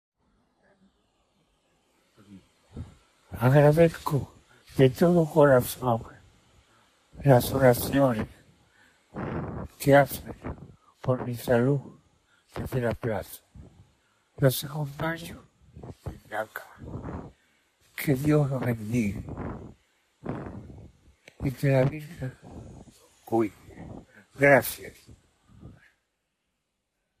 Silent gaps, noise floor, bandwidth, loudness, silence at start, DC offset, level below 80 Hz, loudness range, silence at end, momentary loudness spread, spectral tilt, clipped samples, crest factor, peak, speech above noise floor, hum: none; -80 dBFS; 15.5 kHz; -25 LUFS; 2.3 s; under 0.1%; -52 dBFS; 9 LU; 1.5 s; 24 LU; -6.5 dB/octave; under 0.1%; 22 dB; -6 dBFS; 55 dB; none